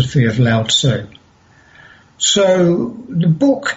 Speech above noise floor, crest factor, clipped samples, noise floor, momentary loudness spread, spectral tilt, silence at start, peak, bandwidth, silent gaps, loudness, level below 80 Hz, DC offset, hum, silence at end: 35 dB; 12 dB; under 0.1%; -49 dBFS; 7 LU; -4.5 dB/octave; 0 s; -4 dBFS; 8.2 kHz; none; -14 LUFS; -46 dBFS; under 0.1%; none; 0 s